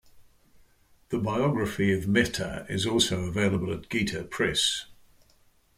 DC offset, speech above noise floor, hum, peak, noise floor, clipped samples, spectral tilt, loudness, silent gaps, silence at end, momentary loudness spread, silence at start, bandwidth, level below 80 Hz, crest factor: under 0.1%; 35 dB; none; -8 dBFS; -62 dBFS; under 0.1%; -4 dB/octave; -27 LUFS; none; 0.85 s; 7 LU; 0.15 s; 16 kHz; -52 dBFS; 20 dB